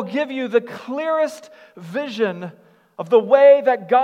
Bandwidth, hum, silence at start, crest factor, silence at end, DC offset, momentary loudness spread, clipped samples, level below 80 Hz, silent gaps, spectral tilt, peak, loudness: 9.2 kHz; none; 0 s; 18 dB; 0 s; under 0.1%; 18 LU; under 0.1%; -84 dBFS; none; -6 dB/octave; -2 dBFS; -18 LUFS